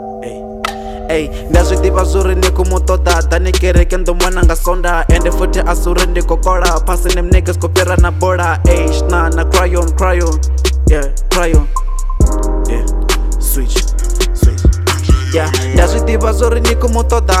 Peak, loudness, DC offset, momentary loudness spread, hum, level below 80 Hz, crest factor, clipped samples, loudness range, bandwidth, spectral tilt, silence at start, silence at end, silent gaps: 0 dBFS; -13 LUFS; under 0.1%; 5 LU; none; -12 dBFS; 10 dB; 0.2%; 2 LU; 15.5 kHz; -5 dB/octave; 0 s; 0 s; none